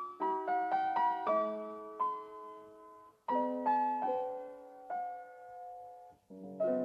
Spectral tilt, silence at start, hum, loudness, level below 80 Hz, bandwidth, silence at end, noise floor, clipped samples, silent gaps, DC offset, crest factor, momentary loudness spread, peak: -7 dB/octave; 0 s; none; -35 LUFS; -84 dBFS; 8 kHz; 0 s; -57 dBFS; under 0.1%; none; under 0.1%; 16 dB; 20 LU; -22 dBFS